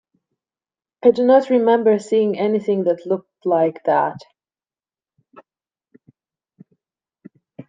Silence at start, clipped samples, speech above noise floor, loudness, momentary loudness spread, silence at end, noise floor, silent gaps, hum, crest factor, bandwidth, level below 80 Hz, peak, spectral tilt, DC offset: 1.05 s; under 0.1%; over 73 dB; -18 LUFS; 9 LU; 0.05 s; under -90 dBFS; none; none; 18 dB; 9.2 kHz; -74 dBFS; -2 dBFS; -7 dB/octave; under 0.1%